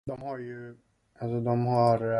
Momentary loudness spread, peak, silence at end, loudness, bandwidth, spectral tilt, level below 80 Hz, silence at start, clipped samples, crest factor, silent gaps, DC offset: 18 LU; -10 dBFS; 0 s; -28 LUFS; 11 kHz; -9 dB/octave; -62 dBFS; 0.05 s; under 0.1%; 18 dB; none; under 0.1%